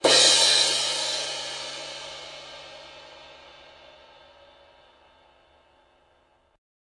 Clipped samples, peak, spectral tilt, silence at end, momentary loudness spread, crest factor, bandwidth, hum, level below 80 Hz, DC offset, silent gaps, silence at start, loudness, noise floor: under 0.1%; -6 dBFS; 0.5 dB/octave; 3.55 s; 28 LU; 22 dB; 11.5 kHz; none; -68 dBFS; under 0.1%; none; 0.05 s; -20 LUFS; -64 dBFS